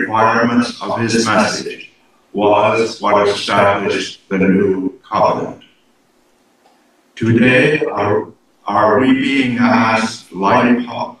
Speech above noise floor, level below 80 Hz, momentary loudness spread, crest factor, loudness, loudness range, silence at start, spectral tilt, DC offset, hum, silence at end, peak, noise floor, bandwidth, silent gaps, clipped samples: 42 dB; -52 dBFS; 10 LU; 16 dB; -14 LUFS; 4 LU; 0 s; -5.5 dB/octave; under 0.1%; none; 0.05 s; 0 dBFS; -56 dBFS; 11.5 kHz; none; under 0.1%